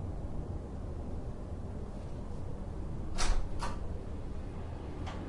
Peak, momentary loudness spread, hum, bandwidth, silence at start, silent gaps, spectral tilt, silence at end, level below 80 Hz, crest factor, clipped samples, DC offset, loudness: -18 dBFS; 7 LU; none; 11.5 kHz; 0 s; none; -5.5 dB/octave; 0 s; -40 dBFS; 18 dB; under 0.1%; under 0.1%; -41 LUFS